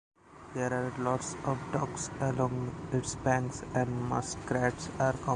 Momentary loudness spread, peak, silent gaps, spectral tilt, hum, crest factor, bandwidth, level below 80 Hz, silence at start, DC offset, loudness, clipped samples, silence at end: 5 LU; -14 dBFS; none; -5.5 dB/octave; none; 18 dB; 10.5 kHz; -54 dBFS; 0.25 s; under 0.1%; -33 LUFS; under 0.1%; 0 s